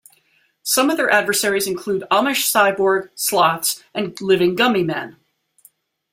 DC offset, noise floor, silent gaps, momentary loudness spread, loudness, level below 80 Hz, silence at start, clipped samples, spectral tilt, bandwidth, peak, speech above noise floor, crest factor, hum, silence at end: under 0.1%; -61 dBFS; none; 9 LU; -18 LUFS; -62 dBFS; 0.65 s; under 0.1%; -2.5 dB/octave; 16.5 kHz; -2 dBFS; 43 dB; 18 dB; none; 1 s